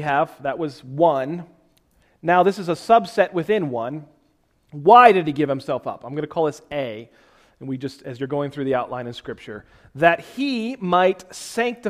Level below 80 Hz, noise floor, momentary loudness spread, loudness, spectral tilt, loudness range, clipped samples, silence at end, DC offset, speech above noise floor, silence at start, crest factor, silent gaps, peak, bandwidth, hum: -60 dBFS; -63 dBFS; 16 LU; -20 LUFS; -6 dB/octave; 10 LU; under 0.1%; 0 s; under 0.1%; 43 dB; 0 s; 22 dB; none; 0 dBFS; 14.5 kHz; none